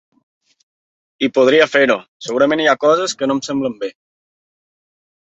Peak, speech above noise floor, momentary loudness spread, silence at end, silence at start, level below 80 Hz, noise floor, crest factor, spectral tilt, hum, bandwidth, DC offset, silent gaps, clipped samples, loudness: -2 dBFS; over 75 dB; 11 LU; 1.35 s; 1.2 s; -64 dBFS; under -90 dBFS; 16 dB; -3.5 dB/octave; none; 8.2 kHz; under 0.1%; 2.08-2.20 s; under 0.1%; -15 LUFS